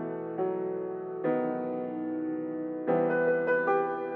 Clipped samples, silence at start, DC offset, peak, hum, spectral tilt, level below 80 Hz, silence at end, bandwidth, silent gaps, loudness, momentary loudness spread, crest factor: under 0.1%; 0 s; under 0.1%; -16 dBFS; none; -10 dB/octave; -80 dBFS; 0 s; 4.1 kHz; none; -30 LUFS; 8 LU; 14 dB